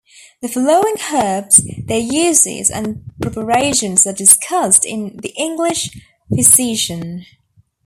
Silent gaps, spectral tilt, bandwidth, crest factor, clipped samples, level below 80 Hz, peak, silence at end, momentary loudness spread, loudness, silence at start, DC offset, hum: none; -2.5 dB/octave; over 20 kHz; 16 dB; 0.2%; -48 dBFS; 0 dBFS; 0.6 s; 16 LU; -13 LUFS; 0.4 s; under 0.1%; none